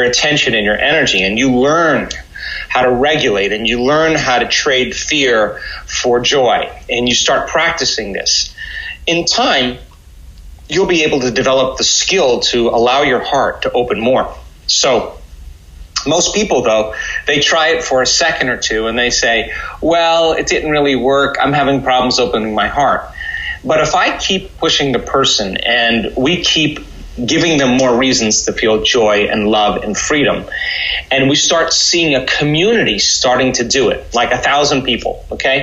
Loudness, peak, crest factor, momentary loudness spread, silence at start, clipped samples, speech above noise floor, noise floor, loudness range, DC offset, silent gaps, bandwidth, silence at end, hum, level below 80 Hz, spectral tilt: -12 LUFS; -2 dBFS; 12 dB; 7 LU; 0 s; under 0.1%; 24 dB; -37 dBFS; 3 LU; under 0.1%; none; 11.5 kHz; 0 s; none; -36 dBFS; -2.5 dB/octave